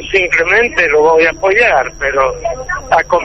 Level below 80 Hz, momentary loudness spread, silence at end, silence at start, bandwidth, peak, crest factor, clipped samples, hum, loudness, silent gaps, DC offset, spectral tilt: -34 dBFS; 7 LU; 0 s; 0 s; 8.2 kHz; 0 dBFS; 12 dB; under 0.1%; none; -11 LUFS; none; under 0.1%; -3.5 dB/octave